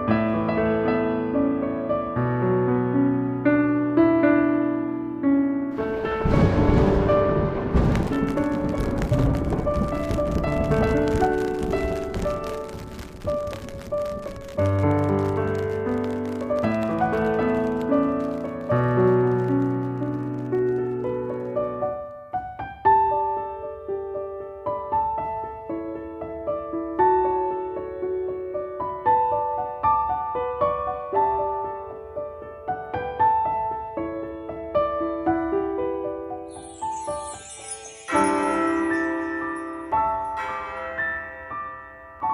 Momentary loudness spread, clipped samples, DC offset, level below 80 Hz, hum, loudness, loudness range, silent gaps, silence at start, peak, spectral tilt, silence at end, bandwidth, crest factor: 13 LU; under 0.1%; under 0.1%; -38 dBFS; none; -24 LUFS; 6 LU; none; 0 s; -6 dBFS; -7.5 dB/octave; 0 s; 14 kHz; 18 dB